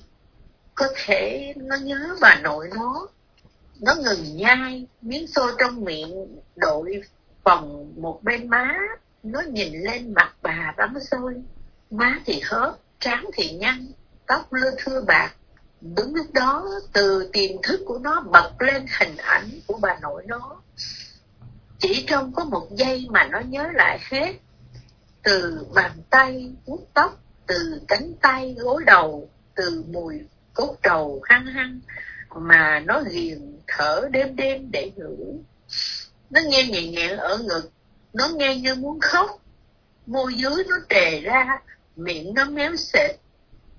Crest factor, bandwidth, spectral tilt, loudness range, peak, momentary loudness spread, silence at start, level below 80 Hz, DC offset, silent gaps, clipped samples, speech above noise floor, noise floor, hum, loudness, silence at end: 22 dB; 5.4 kHz; -3.5 dB/octave; 5 LU; 0 dBFS; 17 LU; 0.75 s; -48 dBFS; under 0.1%; none; under 0.1%; 35 dB; -57 dBFS; none; -21 LUFS; 0.65 s